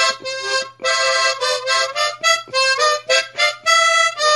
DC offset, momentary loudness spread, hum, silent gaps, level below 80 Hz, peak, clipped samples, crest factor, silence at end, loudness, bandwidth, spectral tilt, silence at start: under 0.1%; 6 LU; none; none; -72 dBFS; -2 dBFS; under 0.1%; 14 dB; 0 s; -16 LUFS; 11.5 kHz; 2 dB/octave; 0 s